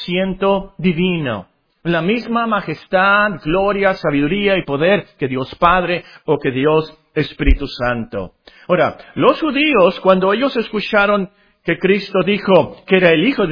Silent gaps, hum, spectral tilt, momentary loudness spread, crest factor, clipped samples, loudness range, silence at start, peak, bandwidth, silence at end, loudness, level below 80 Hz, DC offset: none; none; -8 dB/octave; 9 LU; 16 dB; under 0.1%; 3 LU; 0 s; 0 dBFS; 5.4 kHz; 0 s; -16 LUFS; -30 dBFS; under 0.1%